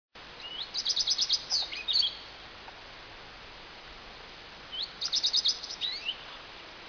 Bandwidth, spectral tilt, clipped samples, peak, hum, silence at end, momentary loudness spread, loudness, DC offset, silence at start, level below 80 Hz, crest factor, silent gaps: 5.4 kHz; 1 dB/octave; under 0.1%; -14 dBFS; none; 0 s; 22 LU; -27 LUFS; under 0.1%; 0.15 s; -60 dBFS; 20 dB; none